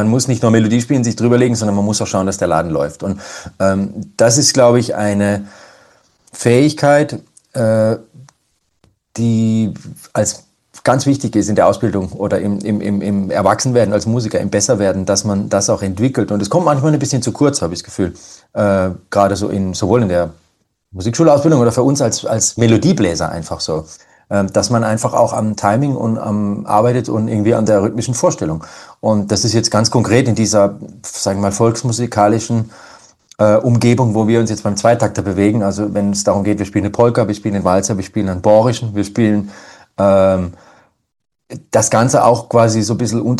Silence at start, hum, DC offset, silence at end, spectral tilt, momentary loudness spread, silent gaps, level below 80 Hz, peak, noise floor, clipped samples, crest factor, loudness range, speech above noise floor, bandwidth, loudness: 0 s; none; under 0.1%; 0 s; -5.5 dB/octave; 9 LU; none; -46 dBFS; 0 dBFS; -64 dBFS; under 0.1%; 14 dB; 2 LU; 50 dB; 12.5 kHz; -14 LUFS